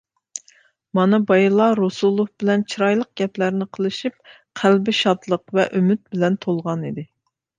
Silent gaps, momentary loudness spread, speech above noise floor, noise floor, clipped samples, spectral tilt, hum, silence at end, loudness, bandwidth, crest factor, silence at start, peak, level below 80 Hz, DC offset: none; 14 LU; 37 dB; -56 dBFS; under 0.1%; -6 dB/octave; none; 0.55 s; -20 LUFS; 9.4 kHz; 18 dB; 0.35 s; -2 dBFS; -66 dBFS; under 0.1%